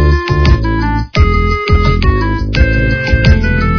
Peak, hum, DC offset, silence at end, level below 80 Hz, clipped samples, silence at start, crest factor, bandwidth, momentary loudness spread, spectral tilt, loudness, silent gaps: 0 dBFS; none; 0.6%; 0 s; -14 dBFS; 0.3%; 0 s; 10 dB; 5.4 kHz; 4 LU; -7.5 dB/octave; -12 LUFS; none